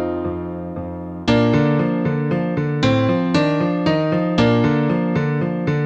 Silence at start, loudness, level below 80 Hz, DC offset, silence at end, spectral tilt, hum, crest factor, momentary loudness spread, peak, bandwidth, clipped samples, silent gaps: 0 s; -19 LUFS; -44 dBFS; under 0.1%; 0 s; -7.5 dB/octave; none; 14 dB; 11 LU; -4 dBFS; 8.2 kHz; under 0.1%; none